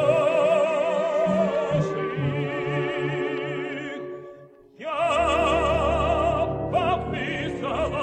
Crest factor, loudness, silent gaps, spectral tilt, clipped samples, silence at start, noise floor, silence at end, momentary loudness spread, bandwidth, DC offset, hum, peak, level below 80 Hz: 16 dB; -24 LUFS; none; -6.5 dB/octave; under 0.1%; 0 s; -47 dBFS; 0 s; 10 LU; 9.4 kHz; under 0.1%; none; -8 dBFS; -40 dBFS